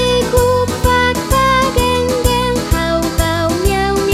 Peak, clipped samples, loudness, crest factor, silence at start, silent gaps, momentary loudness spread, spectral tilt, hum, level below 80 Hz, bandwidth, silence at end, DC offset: 0 dBFS; under 0.1%; -14 LUFS; 14 dB; 0 s; none; 3 LU; -4.5 dB/octave; none; -22 dBFS; 16.5 kHz; 0 s; under 0.1%